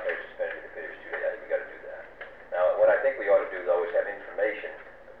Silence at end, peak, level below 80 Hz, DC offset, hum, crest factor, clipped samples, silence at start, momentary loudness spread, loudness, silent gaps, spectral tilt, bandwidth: 0 s; -12 dBFS; -64 dBFS; 0.2%; 60 Hz at -70 dBFS; 16 dB; under 0.1%; 0 s; 19 LU; -28 LUFS; none; -6 dB/octave; 4.2 kHz